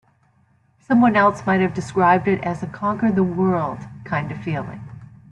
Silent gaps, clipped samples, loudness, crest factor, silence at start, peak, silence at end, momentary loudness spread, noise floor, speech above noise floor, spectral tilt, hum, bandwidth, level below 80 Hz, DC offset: none; under 0.1%; -20 LUFS; 16 dB; 0.9 s; -4 dBFS; 0.25 s; 12 LU; -59 dBFS; 40 dB; -7.5 dB/octave; none; 9.4 kHz; -56 dBFS; under 0.1%